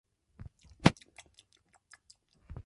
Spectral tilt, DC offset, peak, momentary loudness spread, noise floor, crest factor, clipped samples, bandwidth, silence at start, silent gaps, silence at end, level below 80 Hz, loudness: -5.5 dB/octave; under 0.1%; -4 dBFS; 26 LU; -69 dBFS; 34 dB; under 0.1%; 11.5 kHz; 0.85 s; none; 1.75 s; -54 dBFS; -29 LUFS